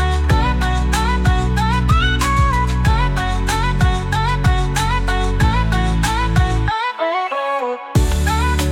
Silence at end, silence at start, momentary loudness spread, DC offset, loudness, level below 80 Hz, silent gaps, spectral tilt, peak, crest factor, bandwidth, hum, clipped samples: 0 s; 0 s; 4 LU; under 0.1%; -17 LUFS; -20 dBFS; none; -5.5 dB/octave; -4 dBFS; 12 dB; 16 kHz; none; under 0.1%